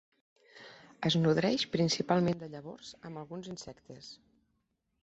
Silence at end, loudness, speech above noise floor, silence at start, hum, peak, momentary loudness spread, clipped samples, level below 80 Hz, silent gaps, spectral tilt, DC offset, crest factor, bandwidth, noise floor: 0.9 s; -31 LUFS; 47 dB; 0.55 s; none; -14 dBFS; 23 LU; under 0.1%; -68 dBFS; none; -5.5 dB/octave; under 0.1%; 20 dB; 8.2 kHz; -80 dBFS